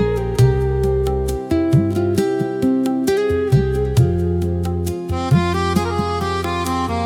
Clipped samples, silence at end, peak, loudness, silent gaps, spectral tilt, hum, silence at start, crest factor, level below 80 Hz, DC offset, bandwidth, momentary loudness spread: under 0.1%; 0 s; -4 dBFS; -18 LUFS; none; -7 dB/octave; none; 0 s; 12 dB; -30 dBFS; under 0.1%; 17 kHz; 5 LU